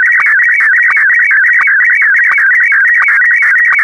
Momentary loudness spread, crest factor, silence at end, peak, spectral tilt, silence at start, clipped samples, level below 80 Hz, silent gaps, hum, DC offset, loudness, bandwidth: 0 LU; 6 dB; 0 s; 0 dBFS; 1 dB/octave; 0 s; under 0.1%; -64 dBFS; none; none; under 0.1%; -6 LUFS; 14.5 kHz